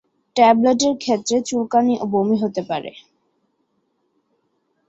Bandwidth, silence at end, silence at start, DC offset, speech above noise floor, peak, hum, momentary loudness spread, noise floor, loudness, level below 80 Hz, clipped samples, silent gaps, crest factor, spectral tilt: 8 kHz; 2 s; 0.35 s; under 0.1%; 51 dB; -2 dBFS; none; 13 LU; -69 dBFS; -18 LUFS; -62 dBFS; under 0.1%; none; 18 dB; -4.5 dB/octave